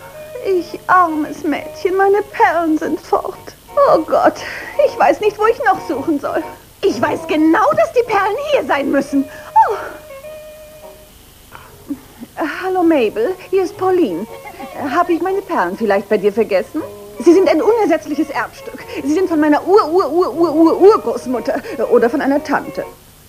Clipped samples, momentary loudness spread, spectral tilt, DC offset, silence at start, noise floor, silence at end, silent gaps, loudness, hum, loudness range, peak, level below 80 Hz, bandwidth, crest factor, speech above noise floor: under 0.1%; 16 LU; -5 dB/octave; under 0.1%; 0 s; -42 dBFS; 0.35 s; none; -15 LUFS; none; 6 LU; 0 dBFS; -50 dBFS; 15.5 kHz; 16 dB; 27 dB